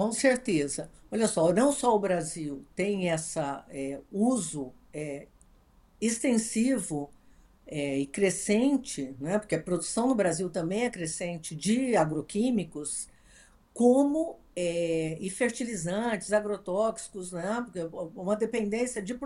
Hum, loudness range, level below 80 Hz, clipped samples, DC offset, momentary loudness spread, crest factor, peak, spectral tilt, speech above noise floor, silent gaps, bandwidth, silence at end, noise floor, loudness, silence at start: none; 4 LU; -60 dBFS; under 0.1%; under 0.1%; 12 LU; 20 dB; -10 dBFS; -4.5 dB/octave; 31 dB; none; 12.5 kHz; 0 s; -60 dBFS; -29 LUFS; 0 s